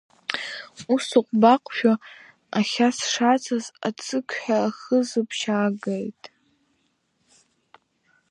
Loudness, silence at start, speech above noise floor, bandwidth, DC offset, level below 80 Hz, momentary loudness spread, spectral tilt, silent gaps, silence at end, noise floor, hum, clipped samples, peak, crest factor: -23 LUFS; 0.3 s; 47 dB; 11.5 kHz; under 0.1%; -76 dBFS; 12 LU; -4 dB/octave; none; 2.05 s; -70 dBFS; none; under 0.1%; -2 dBFS; 22 dB